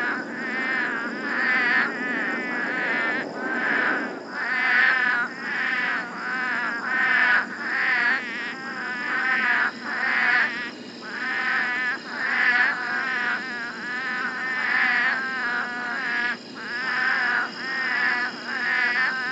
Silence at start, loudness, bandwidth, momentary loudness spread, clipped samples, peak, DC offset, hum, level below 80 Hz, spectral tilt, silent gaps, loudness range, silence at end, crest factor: 0 s; -23 LUFS; 8.6 kHz; 9 LU; under 0.1%; -8 dBFS; under 0.1%; none; -86 dBFS; -3 dB/octave; none; 2 LU; 0 s; 18 dB